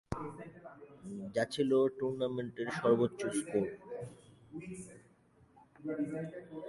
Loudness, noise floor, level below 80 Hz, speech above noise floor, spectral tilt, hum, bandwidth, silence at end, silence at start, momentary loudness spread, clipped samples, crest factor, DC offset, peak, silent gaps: -36 LUFS; -66 dBFS; -64 dBFS; 31 dB; -6 dB/octave; none; 11.5 kHz; 0 s; 0.1 s; 20 LU; under 0.1%; 20 dB; under 0.1%; -16 dBFS; none